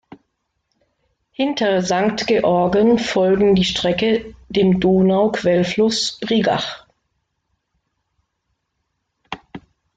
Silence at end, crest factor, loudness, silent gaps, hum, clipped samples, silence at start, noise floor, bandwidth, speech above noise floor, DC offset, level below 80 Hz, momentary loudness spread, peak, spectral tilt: 0.4 s; 14 dB; -17 LUFS; none; none; under 0.1%; 1.4 s; -74 dBFS; 9 kHz; 57 dB; under 0.1%; -48 dBFS; 13 LU; -4 dBFS; -5.5 dB/octave